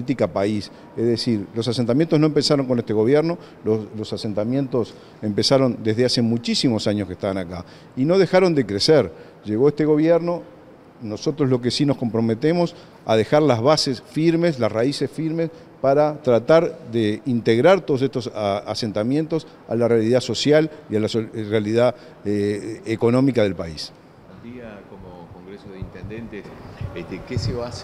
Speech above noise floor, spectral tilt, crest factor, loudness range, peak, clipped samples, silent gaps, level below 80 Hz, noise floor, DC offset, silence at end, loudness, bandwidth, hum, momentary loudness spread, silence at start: 20 dB; -6 dB/octave; 18 dB; 5 LU; -2 dBFS; under 0.1%; none; -52 dBFS; -40 dBFS; under 0.1%; 0 s; -20 LUFS; 13 kHz; none; 17 LU; 0 s